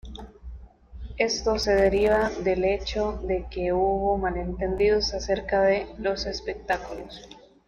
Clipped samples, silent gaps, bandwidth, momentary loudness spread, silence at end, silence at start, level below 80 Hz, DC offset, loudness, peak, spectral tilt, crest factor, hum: under 0.1%; none; 8.4 kHz; 20 LU; 0.3 s; 0.05 s; -40 dBFS; under 0.1%; -25 LUFS; -8 dBFS; -4.5 dB/octave; 18 dB; none